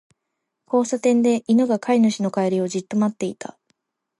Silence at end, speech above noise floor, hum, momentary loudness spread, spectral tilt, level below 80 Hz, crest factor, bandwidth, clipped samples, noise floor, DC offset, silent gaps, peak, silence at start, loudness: 0.75 s; 59 dB; none; 11 LU; -6 dB/octave; -72 dBFS; 14 dB; 11.5 kHz; under 0.1%; -79 dBFS; under 0.1%; none; -6 dBFS; 0.7 s; -20 LUFS